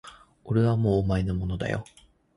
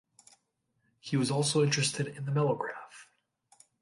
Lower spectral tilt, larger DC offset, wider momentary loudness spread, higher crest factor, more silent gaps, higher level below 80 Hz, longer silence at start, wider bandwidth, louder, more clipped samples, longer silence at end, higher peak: first, -8.5 dB/octave vs -4.5 dB/octave; neither; second, 8 LU vs 18 LU; about the same, 16 dB vs 18 dB; neither; first, -42 dBFS vs -74 dBFS; second, 0.05 s vs 1.05 s; about the same, 11 kHz vs 11.5 kHz; first, -26 LUFS vs -30 LUFS; neither; second, 0.55 s vs 0.8 s; first, -10 dBFS vs -16 dBFS